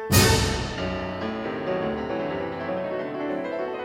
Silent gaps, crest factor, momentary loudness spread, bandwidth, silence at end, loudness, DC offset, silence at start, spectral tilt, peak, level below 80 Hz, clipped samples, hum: none; 22 dB; 10 LU; 16 kHz; 0 s; -26 LUFS; under 0.1%; 0 s; -4 dB/octave; -4 dBFS; -38 dBFS; under 0.1%; none